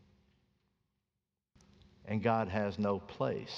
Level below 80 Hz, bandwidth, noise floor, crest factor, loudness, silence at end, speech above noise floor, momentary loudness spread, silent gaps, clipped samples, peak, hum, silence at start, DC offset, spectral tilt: -68 dBFS; 7.2 kHz; -89 dBFS; 22 dB; -35 LUFS; 0 s; 55 dB; 7 LU; none; under 0.1%; -16 dBFS; none; 2.05 s; under 0.1%; -7.5 dB/octave